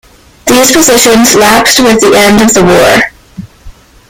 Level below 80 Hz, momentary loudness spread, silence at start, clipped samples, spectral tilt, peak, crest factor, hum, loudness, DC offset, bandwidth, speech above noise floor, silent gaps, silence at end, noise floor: -32 dBFS; 5 LU; 0.45 s; 2%; -2.5 dB/octave; 0 dBFS; 6 dB; none; -4 LUFS; under 0.1%; over 20 kHz; 27 dB; none; 0.4 s; -31 dBFS